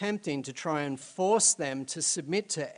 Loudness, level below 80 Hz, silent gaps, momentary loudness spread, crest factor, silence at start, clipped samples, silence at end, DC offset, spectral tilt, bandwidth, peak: -29 LUFS; -78 dBFS; none; 11 LU; 18 dB; 0 s; under 0.1%; 0.05 s; under 0.1%; -2.5 dB/octave; 10.5 kHz; -12 dBFS